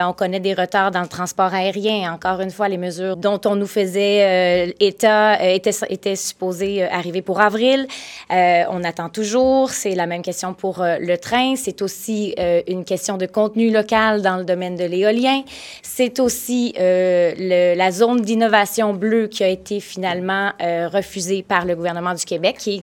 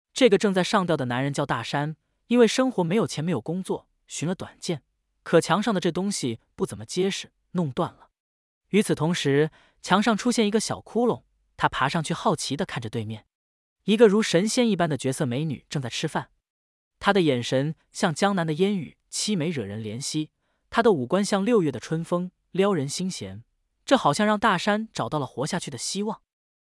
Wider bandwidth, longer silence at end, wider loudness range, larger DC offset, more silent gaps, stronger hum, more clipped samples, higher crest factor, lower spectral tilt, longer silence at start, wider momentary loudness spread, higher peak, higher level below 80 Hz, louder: first, 17.5 kHz vs 12 kHz; second, 0.15 s vs 0.55 s; about the same, 4 LU vs 3 LU; neither; second, none vs 8.20-8.61 s, 13.35-13.76 s, 16.50-16.91 s; neither; neither; about the same, 18 dB vs 20 dB; about the same, -4 dB/octave vs -5 dB/octave; second, 0 s vs 0.15 s; second, 8 LU vs 11 LU; first, 0 dBFS vs -6 dBFS; about the same, -56 dBFS vs -60 dBFS; first, -18 LUFS vs -25 LUFS